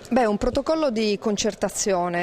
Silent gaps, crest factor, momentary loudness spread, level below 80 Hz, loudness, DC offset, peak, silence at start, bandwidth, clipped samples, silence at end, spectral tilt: none; 14 dB; 3 LU; -42 dBFS; -23 LUFS; under 0.1%; -8 dBFS; 0 s; 16 kHz; under 0.1%; 0 s; -4 dB/octave